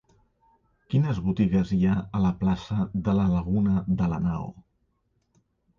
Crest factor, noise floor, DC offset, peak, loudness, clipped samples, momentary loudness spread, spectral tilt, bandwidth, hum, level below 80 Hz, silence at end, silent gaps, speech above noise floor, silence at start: 14 dB; -72 dBFS; under 0.1%; -12 dBFS; -25 LUFS; under 0.1%; 5 LU; -9 dB/octave; 7 kHz; none; -44 dBFS; 1.2 s; none; 48 dB; 0.9 s